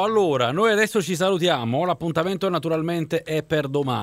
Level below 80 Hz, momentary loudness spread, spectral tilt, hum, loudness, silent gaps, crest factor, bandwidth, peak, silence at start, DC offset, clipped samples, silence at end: -58 dBFS; 5 LU; -5.5 dB/octave; none; -22 LUFS; none; 16 dB; 16 kHz; -6 dBFS; 0 s; under 0.1%; under 0.1%; 0 s